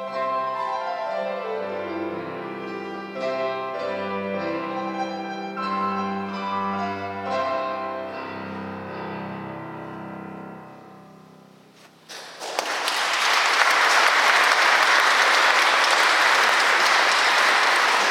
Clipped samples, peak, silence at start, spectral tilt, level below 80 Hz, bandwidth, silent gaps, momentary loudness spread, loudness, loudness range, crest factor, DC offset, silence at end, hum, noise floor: under 0.1%; -2 dBFS; 0 s; -1.5 dB/octave; -80 dBFS; 19 kHz; none; 17 LU; -20 LUFS; 18 LU; 22 dB; under 0.1%; 0 s; none; -51 dBFS